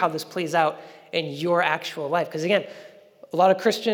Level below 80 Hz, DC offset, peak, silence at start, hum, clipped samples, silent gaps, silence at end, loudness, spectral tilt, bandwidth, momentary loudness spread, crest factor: under -90 dBFS; under 0.1%; -6 dBFS; 0 s; none; under 0.1%; none; 0 s; -24 LUFS; -4.5 dB/octave; over 20 kHz; 10 LU; 18 dB